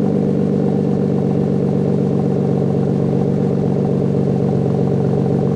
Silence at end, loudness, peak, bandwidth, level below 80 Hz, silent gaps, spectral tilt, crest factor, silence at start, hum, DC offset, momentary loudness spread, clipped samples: 0 s; -17 LUFS; -6 dBFS; 7.8 kHz; -48 dBFS; none; -10.5 dB/octave; 10 dB; 0 s; none; under 0.1%; 0 LU; under 0.1%